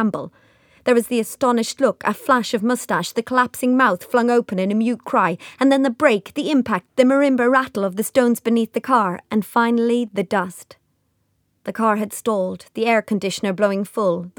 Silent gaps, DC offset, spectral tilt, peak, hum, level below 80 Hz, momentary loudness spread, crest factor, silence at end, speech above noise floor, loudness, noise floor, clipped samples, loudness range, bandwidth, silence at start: none; under 0.1%; -5 dB/octave; -2 dBFS; none; -66 dBFS; 7 LU; 18 dB; 0.1 s; 48 dB; -19 LUFS; -67 dBFS; under 0.1%; 4 LU; 20 kHz; 0 s